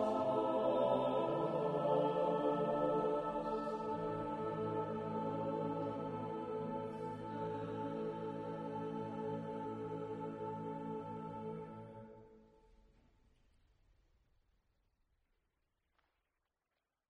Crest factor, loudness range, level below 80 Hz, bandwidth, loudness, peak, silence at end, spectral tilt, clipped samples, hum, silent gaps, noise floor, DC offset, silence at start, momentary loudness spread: 18 dB; 13 LU; -70 dBFS; 10 kHz; -40 LUFS; -22 dBFS; 4.65 s; -8.5 dB/octave; under 0.1%; none; none; -90 dBFS; under 0.1%; 0 s; 10 LU